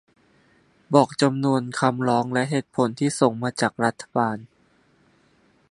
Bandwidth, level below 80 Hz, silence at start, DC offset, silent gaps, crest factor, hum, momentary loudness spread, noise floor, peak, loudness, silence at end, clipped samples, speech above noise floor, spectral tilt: 11.5 kHz; -66 dBFS; 0.9 s; under 0.1%; none; 22 dB; none; 5 LU; -61 dBFS; -2 dBFS; -23 LUFS; 1.25 s; under 0.1%; 39 dB; -5.5 dB/octave